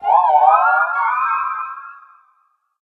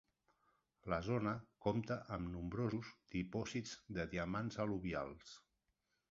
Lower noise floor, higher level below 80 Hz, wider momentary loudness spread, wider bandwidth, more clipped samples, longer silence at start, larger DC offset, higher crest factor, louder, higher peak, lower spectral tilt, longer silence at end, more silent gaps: second, -62 dBFS vs -86 dBFS; second, -70 dBFS vs -62 dBFS; first, 15 LU vs 8 LU; second, 4.5 kHz vs 7.6 kHz; neither; second, 0 s vs 0.85 s; neither; second, 16 dB vs 22 dB; first, -15 LUFS vs -43 LUFS; first, 0 dBFS vs -22 dBFS; second, -3 dB/octave vs -6 dB/octave; first, 0.9 s vs 0.7 s; neither